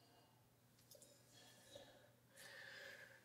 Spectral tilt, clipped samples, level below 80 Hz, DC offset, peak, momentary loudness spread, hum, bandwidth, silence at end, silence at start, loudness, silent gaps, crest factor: -2 dB/octave; under 0.1%; under -90 dBFS; under 0.1%; -44 dBFS; 11 LU; none; 16 kHz; 0 s; 0 s; -61 LUFS; none; 18 dB